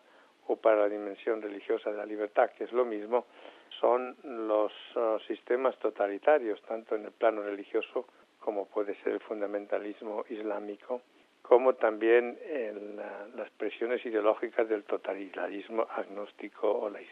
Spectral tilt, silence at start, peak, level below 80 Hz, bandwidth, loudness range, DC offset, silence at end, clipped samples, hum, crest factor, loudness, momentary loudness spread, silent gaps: -6 dB/octave; 0.5 s; -10 dBFS; -90 dBFS; 4.9 kHz; 4 LU; under 0.1%; 0 s; under 0.1%; none; 22 dB; -32 LUFS; 13 LU; none